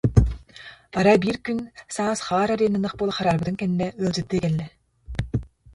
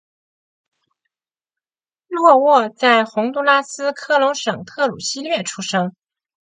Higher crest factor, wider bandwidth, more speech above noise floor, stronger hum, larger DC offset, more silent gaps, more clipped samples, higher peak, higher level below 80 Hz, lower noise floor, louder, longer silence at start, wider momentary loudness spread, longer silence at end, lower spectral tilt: about the same, 22 dB vs 18 dB; first, 11.5 kHz vs 9.6 kHz; second, 23 dB vs over 73 dB; neither; neither; neither; neither; about the same, -2 dBFS vs 0 dBFS; first, -36 dBFS vs -70 dBFS; second, -46 dBFS vs under -90 dBFS; second, -24 LUFS vs -17 LUFS; second, 0.05 s vs 2.1 s; about the same, 14 LU vs 12 LU; second, 0.3 s vs 0.55 s; first, -6.5 dB/octave vs -3.5 dB/octave